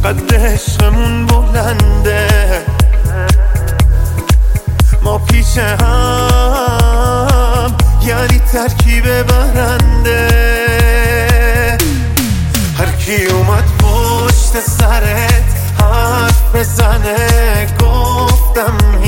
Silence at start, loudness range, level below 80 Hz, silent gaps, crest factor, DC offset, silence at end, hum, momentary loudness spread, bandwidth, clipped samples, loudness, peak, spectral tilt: 0 s; 1 LU; -12 dBFS; none; 10 dB; under 0.1%; 0 s; none; 3 LU; 17 kHz; under 0.1%; -11 LUFS; 0 dBFS; -5 dB/octave